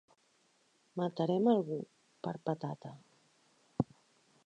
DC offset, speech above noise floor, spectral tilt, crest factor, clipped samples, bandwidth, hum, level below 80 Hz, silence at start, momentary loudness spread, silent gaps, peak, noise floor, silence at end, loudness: under 0.1%; 38 dB; -8.5 dB/octave; 22 dB; under 0.1%; 9 kHz; none; -70 dBFS; 0.95 s; 18 LU; none; -16 dBFS; -72 dBFS; 0.6 s; -36 LUFS